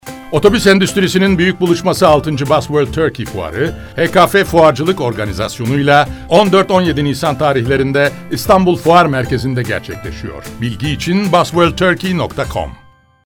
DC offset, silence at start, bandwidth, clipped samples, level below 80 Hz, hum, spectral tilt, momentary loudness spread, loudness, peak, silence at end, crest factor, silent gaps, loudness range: under 0.1%; 0.05 s; 19 kHz; 0.7%; -34 dBFS; none; -5.5 dB/octave; 11 LU; -13 LUFS; 0 dBFS; 0.5 s; 12 dB; none; 4 LU